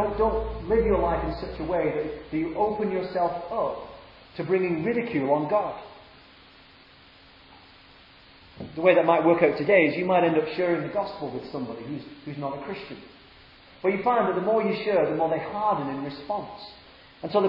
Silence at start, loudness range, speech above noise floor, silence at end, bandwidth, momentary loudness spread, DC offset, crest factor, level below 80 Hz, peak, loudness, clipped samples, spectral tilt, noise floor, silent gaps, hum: 0 s; 9 LU; 28 dB; 0 s; 5.6 kHz; 17 LU; under 0.1%; 22 dB; -46 dBFS; -4 dBFS; -25 LUFS; under 0.1%; -9.5 dB/octave; -53 dBFS; none; none